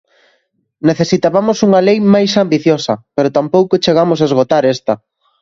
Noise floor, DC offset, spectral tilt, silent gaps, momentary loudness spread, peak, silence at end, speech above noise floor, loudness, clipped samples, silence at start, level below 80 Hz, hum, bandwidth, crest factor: -61 dBFS; under 0.1%; -6 dB/octave; none; 6 LU; 0 dBFS; 0.45 s; 49 dB; -12 LUFS; under 0.1%; 0.85 s; -54 dBFS; none; 7.6 kHz; 12 dB